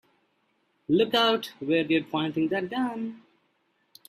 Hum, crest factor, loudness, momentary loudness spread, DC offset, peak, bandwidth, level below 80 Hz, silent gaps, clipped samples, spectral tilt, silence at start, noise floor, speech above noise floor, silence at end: none; 20 dB; -26 LUFS; 11 LU; under 0.1%; -8 dBFS; 15 kHz; -70 dBFS; none; under 0.1%; -5.5 dB/octave; 0.9 s; -71 dBFS; 46 dB; 0.9 s